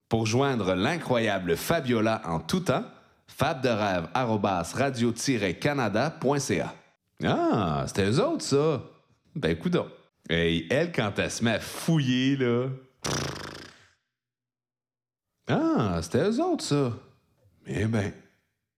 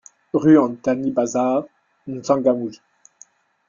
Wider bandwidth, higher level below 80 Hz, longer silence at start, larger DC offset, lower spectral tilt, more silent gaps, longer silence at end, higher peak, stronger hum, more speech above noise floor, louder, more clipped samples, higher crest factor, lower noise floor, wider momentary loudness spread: first, 15.5 kHz vs 7.4 kHz; first, -58 dBFS vs -64 dBFS; second, 0.1 s vs 0.35 s; neither; second, -5.5 dB/octave vs -7 dB/octave; neither; second, 0.6 s vs 0.95 s; second, -12 dBFS vs -4 dBFS; neither; first, over 64 dB vs 34 dB; second, -27 LUFS vs -19 LUFS; neither; about the same, 16 dB vs 18 dB; first, under -90 dBFS vs -52 dBFS; second, 7 LU vs 17 LU